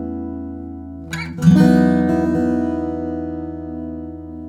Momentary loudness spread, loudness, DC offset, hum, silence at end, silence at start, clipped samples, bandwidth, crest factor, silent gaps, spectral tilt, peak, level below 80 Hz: 18 LU; -18 LUFS; under 0.1%; none; 0 s; 0 s; under 0.1%; 11.5 kHz; 18 dB; none; -8 dB/octave; -2 dBFS; -42 dBFS